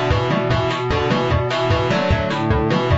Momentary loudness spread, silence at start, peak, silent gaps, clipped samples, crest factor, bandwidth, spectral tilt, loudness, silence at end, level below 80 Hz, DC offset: 1 LU; 0 s; -4 dBFS; none; under 0.1%; 14 dB; 8 kHz; -5 dB/octave; -19 LUFS; 0 s; -30 dBFS; under 0.1%